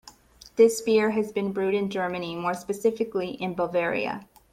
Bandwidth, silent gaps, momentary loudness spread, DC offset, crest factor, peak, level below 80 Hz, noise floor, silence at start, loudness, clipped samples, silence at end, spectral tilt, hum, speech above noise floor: 15.5 kHz; none; 9 LU; under 0.1%; 18 dB; -8 dBFS; -62 dBFS; -51 dBFS; 0.05 s; -26 LUFS; under 0.1%; 0.3 s; -5 dB/octave; none; 26 dB